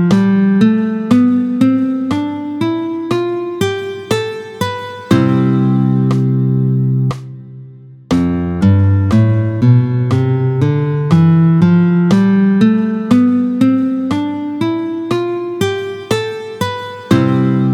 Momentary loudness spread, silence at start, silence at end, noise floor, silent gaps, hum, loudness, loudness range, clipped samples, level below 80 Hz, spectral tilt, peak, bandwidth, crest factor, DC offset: 9 LU; 0 s; 0 s; -35 dBFS; none; none; -14 LUFS; 6 LU; under 0.1%; -46 dBFS; -8 dB/octave; 0 dBFS; 13 kHz; 12 dB; under 0.1%